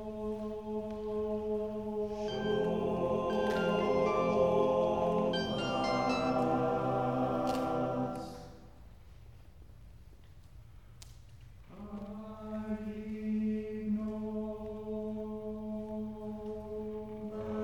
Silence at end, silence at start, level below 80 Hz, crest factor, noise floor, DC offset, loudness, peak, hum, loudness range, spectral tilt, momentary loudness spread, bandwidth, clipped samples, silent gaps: 0 s; 0 s; -56 dBFS; 18 dB; -55 dBFS; 0.1%; -34 LUFS; -16 dBFS; none; 15 LU; -7 dB/octave; 13 LU; 16 kHz; under 0.1%; none